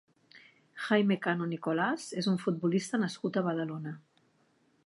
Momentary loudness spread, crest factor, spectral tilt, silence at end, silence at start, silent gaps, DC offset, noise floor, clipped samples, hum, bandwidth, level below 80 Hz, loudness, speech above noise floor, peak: 13 LU; 22 dB; -6 dB/octave; 0.85 s; 0.35 s; none; under 0.1%; -70 dBFS; under 0.1%; none; 11.5 kHz; -82 dBFS; -31 LUFS; 39 dB; -12 dBFS